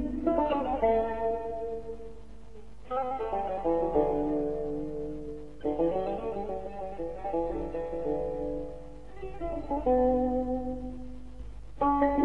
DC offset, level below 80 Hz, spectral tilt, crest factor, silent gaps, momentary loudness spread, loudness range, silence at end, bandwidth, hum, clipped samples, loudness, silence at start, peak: 0.7%; -46 dBFS; -8.5 dB/octave; 18 dB; none; 18 LU; 3 LU; 0 s; 8.6 kHz; 50 Hz at -50 dBFS; under 0.1%; -31 LUFS; 0 s; -12 dBFS